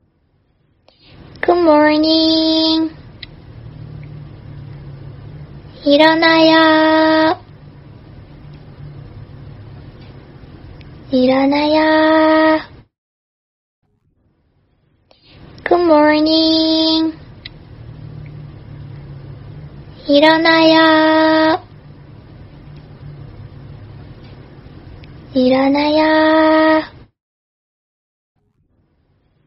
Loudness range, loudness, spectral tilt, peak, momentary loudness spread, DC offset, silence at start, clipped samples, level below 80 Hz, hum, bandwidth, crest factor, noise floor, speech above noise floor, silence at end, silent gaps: 10 LU; -12 LUFS; -7 dB/octave; 0 dBFS; 26 LU; under 0.1%; 1.45 s; under 0.1%; -46 dBFS; none; 6 kHz; 16 dB; -60 dBFS; 49 dB; 2.6 s; 12.98-13.82 s